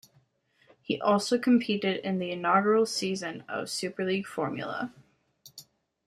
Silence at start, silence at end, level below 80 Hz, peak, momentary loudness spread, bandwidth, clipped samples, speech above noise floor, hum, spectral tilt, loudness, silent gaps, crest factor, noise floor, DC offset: 0.9 s; 0.45 s; -74 dBFS; -10 dBFS; 13 LU; 14.5 kHz; under 0.1%; 40 dB; none; -4.5 dB/octave; -28 LUFS; none; 20 dB; -68 dBFS; under 0.1%